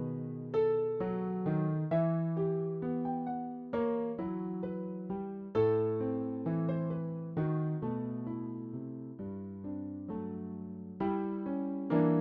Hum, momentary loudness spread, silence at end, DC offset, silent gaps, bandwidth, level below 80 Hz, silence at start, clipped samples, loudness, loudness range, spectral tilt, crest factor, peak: none; 11 LU; 0 s; under 0.1%; none; 4.3 kHz; -66 dBFS; 0 s; under 0.1%; -35 LUFS; 6 LU; -9.5 dB/octave; 16 dB; -16 dBFS